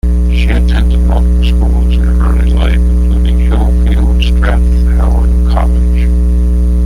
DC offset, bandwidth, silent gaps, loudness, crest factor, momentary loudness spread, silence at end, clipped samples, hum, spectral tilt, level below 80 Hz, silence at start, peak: under 0.1%; 10 kHz; none; -11 LUFS; 6 dB; 1 LU; 0 s; under 0.1%; 60 Hz at -10 dBFS; -7.5 dB/octave; -8 dBFS; 0.05 s; -2 dBFS